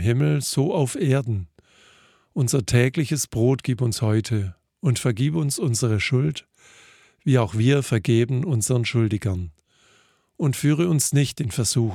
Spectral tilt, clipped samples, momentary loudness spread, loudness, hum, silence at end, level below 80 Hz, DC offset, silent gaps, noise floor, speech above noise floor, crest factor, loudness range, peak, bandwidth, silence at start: -5.5 dB/octave; under 0.1%; 8 LU; -22 LUFS; none; 0 s; -52 dBFS; under 0.1%; none; -60 dBFS; 39 dB; 18 dB; 1 LU; -4 dBFS; 15.5 kHz; 0 s